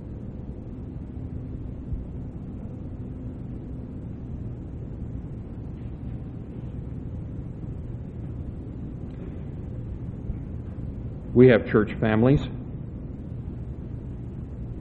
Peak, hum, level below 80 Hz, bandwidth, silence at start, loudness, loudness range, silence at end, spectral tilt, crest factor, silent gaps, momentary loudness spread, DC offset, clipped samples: -4 dBFS; none; -40 dBFS; 4.5 kHz; 0 s; -29 LUFS; 13 LU; 0 s; -10 dB/octave; 24 dB; none; 15 LU; under 0.1%; under 0.1%